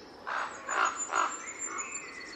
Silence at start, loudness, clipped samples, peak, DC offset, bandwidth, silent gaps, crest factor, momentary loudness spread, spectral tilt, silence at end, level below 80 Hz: 0 s; -33 LUFS; under 0.1%; -16 dBFS; under 0.1%; 12.5 kHz; none; 20 dB; 8 LU; 0 dB/octave; 0 s; -72 dBFS